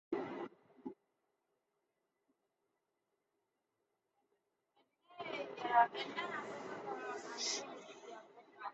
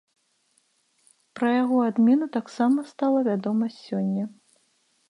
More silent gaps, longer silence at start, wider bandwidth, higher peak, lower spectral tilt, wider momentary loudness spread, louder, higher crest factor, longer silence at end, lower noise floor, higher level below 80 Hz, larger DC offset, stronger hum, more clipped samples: neither; second, 0.1 s vs 1.35 s; second, 8 kHz vs 10.5 kHz; second, -16 dBFS vs -10 dBFS; second, -0.5 dB/octave vs -7.5 dB/octave; first, 21 LU vs 9 LU; second, -40 LUFS vs -24 LUFS; first, 28 dB vs 14 dB; second, 0 s vs 0.8 s; first, -86 dBFS vs -68 dBFS; second, under -90 dBFS vs -80 dBFS; neither; neither; neither